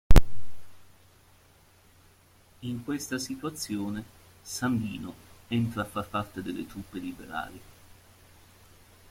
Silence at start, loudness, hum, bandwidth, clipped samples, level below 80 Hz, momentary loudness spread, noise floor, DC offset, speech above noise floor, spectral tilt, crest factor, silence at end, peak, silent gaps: 0.1 s; -33 LUFS; none; 16 kHz; under 0.1%; -32 dBFS; 21 LU; -59 dBFS; under 0.1%; 26 dB; -5.5 dB/octave; 24 dB; 1.55 s; -2 dBFS; none